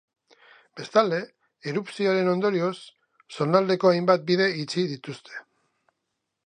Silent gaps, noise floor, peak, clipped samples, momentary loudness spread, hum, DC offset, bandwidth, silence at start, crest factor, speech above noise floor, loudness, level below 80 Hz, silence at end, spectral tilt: none; -81 dBFS; -4 dBFS; under 0.1%; 20 LU; none; under 0.1%; 10 kHz; 0.75 s; 22 dB; 57 dB; -24 LUFS; -76 dBFS; 1.05 s; -6 dB/octave